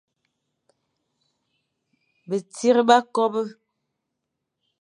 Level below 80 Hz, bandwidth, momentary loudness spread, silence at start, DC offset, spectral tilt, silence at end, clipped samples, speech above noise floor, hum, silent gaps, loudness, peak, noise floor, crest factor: -84 dBFS; 11 kHz; 13 LU; 2.3 s; under 0.1%; -4 dB/octave; 1.3 s; under 0.1%; 61 dB; none; none; -21 LUFS; -2 dBFS; -81 dBFS; 24 dB